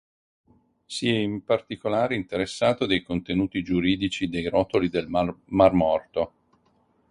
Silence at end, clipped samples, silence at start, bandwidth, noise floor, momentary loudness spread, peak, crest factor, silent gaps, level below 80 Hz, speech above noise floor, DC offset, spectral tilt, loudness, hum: 0.85 s; under 0.1%; 0.9 s; 11 kHz; -65 dBFS; 8 LU; -4 dBFS; 22 dB; none; -50 dBFS; 41 dB; under 0.1%; -6 dB/octave; -25 LUFS; none